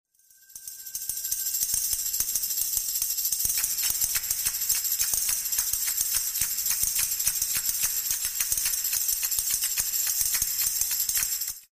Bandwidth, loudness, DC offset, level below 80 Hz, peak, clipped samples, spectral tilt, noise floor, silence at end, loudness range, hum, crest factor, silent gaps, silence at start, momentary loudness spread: 16 kHz; -24 LUFS; under 0.1%; -52 dBFS; -8 dBFS; under 0.1%; 2.5 dB/octave; -57 dBFS; 0.1 s; 1 LU; none; 20 dB; none; 0.5 s; 3 LU